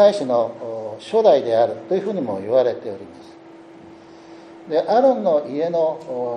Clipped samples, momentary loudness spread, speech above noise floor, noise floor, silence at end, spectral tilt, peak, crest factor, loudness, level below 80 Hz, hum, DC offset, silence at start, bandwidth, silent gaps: under 0.1%; 15 LU; 24 dB; -42 dBFS; 0 s; -6.5 dB/octave; -2 dBFS; 18 dB; -20 LUFS; -72 dBFS; none; under 0.1%; 0 s; 10 kHz; none